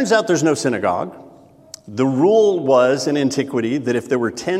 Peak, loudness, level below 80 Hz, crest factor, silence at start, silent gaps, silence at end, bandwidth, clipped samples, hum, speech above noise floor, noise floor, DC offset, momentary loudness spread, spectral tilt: -2 dBFS; -17 LUFS; -64 dBFS; 14 dB; 0 s; none; 0 s; 14 kHz; under 0.1%; none; 25 dB; -42 dBFS; under 0.1%; 7 LU; -5 dB/octave